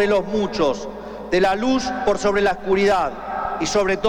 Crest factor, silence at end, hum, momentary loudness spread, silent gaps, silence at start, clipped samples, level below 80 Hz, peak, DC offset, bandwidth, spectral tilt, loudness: 14 dB; 0 s; none; 8 LU; none; 0 s; under 0.1%; -42 dBFS; -6 dBFS; under 0.1%; 11.5 kHz; -4.5 dB/octave; -20 LUFS